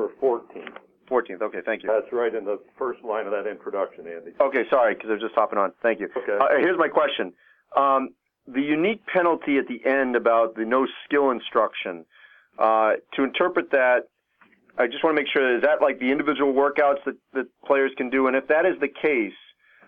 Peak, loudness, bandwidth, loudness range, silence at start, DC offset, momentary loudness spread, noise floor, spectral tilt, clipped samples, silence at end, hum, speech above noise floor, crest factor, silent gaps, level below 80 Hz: -6 dBFS; -23 LUFS; 4.7 kHz; 4 LU; 0 s; under 0.1%; 11 LU; -60 dBFS; -7.5 dB/octave; under 0.1%; 0.5 s; none; 38 dB; 18 dB; none; -70 dBFS